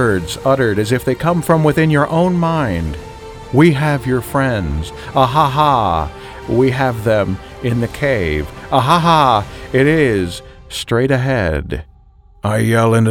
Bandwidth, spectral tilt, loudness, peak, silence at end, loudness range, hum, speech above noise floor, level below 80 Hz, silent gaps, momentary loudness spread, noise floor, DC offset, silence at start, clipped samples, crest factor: 18.5 kHz; -6.5 dB/octave; -15 LUFS; 0 dBFS; 0 s; 2 LU; none; 31 dB; -34 dBFS; none; 12 LU; -45 dBFS; under 0.1%; 0 s; under 0.1%; 14 dB